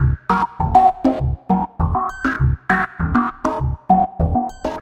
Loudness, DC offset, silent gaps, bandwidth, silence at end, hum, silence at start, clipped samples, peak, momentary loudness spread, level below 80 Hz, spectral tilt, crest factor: -18 LUFS; under 0.1%; none; 8.8 kHz; 0 s; none; 0 s; under 0.1%; 0 dBFS; 7 LU; -28 dBFS; -8.5 dB/octave; 18 dB